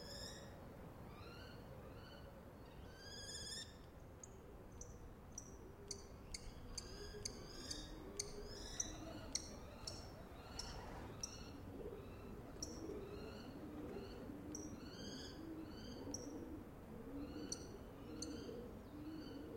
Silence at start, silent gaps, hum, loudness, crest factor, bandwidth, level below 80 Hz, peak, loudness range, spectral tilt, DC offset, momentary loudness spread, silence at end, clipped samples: 0 s; none; none; -52 LUFS; 26 dB; 16.5 kHz; -60 dBFS; -26 dBFS; 5 LU; -3.5 dB/octave; under 0.1%; 9 LU; 0 s; under 0.1%